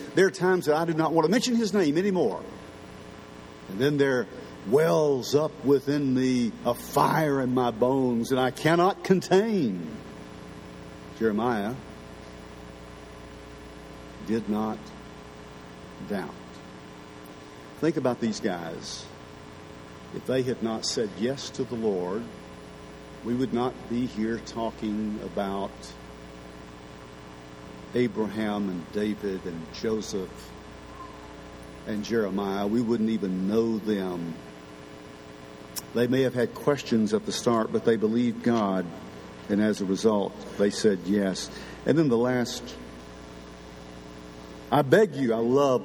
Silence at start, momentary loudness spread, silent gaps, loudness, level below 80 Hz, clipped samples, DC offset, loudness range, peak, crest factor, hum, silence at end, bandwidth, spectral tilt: 0 s; 21 LU; none; -26 LUFS; -56 dBFS; under 0.1%; under 0.1%; 10 LU; -6 dBFS; 22 dB; none; 0 s; 19 kHz; -5.5 dB/octave